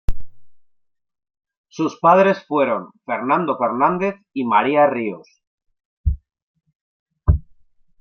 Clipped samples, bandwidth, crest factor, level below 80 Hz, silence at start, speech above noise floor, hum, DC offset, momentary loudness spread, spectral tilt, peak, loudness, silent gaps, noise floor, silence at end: under 0.1%; 6.8 kHz; 18 dB; -32 dBFS; 0.1 s; 45 dB; none; under 0.1%; 13 LU; -8 dB/octave; -2 dBFS; -19 LUFS; 1.57-1.64 s, 5.47-5.58 s, 5.85-6.04 s, 6.42-6.54 s, 6.75-7.06 s; -63 dBFS; 0.6 s